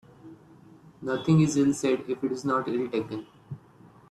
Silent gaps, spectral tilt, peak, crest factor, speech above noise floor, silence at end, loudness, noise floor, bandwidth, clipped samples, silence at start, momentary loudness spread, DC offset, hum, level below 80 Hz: none; -6.5 dB/octave; -10 dBFS; 18 dB; 28 dB; 0.55 s; -26 LUFS; -54 dBFS; 12.5 kHz; under 0.1%; 0.25 s; 22 LU; under 0.1%; none; -64 dBFS